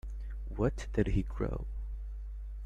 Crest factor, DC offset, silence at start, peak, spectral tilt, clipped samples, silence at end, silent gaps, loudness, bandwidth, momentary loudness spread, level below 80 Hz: 20 dB; under 0.1%; 0.05 s; -14 dBFS; -8 dB/octave; under 0.1%; 0 s; none; -37 LUFS; 9 kHz; 12 LU; -38 dBFS